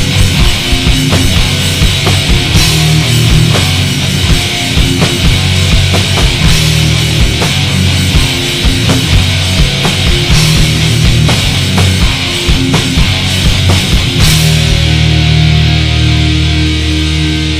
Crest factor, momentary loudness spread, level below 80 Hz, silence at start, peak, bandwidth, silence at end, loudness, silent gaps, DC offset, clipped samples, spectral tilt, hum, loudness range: 8 dB; 3 LU; -16 dBFS; 0 s; 0 dBFS; 16 kHz; 0 s; -9 LUFS; none; under 0.1%; 0.8%; -4 dB/octave; none; 1 LU